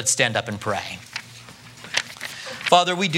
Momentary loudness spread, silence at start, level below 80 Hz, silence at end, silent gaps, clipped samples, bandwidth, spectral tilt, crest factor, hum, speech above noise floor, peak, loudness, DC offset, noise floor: 23 LU; 0 s; -64 dBFS; 0 s; none; under 0.1%; 16.5 kHz; -2.5 dB/octave; 24 dB; none; 22 dB; 0 dBFS; -23 LUFS; under 0.1%; -43 dBFS